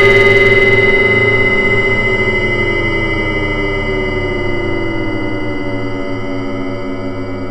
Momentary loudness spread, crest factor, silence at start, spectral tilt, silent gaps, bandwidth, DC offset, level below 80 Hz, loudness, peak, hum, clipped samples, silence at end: 13 LU; 12 dB; 0 s; -6 dB/octave; none; 9.2 kHz; under 0.1%; -24 dBFS; -13 LUFS; 0 dBFS; none; under 0.1%; 0 s